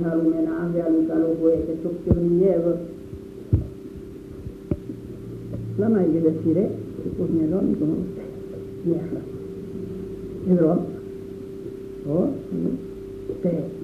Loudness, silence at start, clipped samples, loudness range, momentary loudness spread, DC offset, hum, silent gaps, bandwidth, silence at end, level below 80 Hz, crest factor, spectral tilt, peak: -24 LUFS; 0 s; under 0.1%; 5 LU; 16 LU; under 0.1%; none; none; 5.8 kHz; 0 s; -42 dBFS; 20 dB; -10.5 dB/octave; -4 dBFS